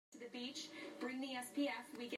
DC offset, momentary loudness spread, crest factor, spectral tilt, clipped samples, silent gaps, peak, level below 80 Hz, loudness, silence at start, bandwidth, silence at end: under 0.1%; 7 LU; 16 dB; -2.5 dB/octave; under 0.1%; none; -30 dBFS; under -90 dBFS; -46 LUFS; 0.1 s; 14 kHz; 0 s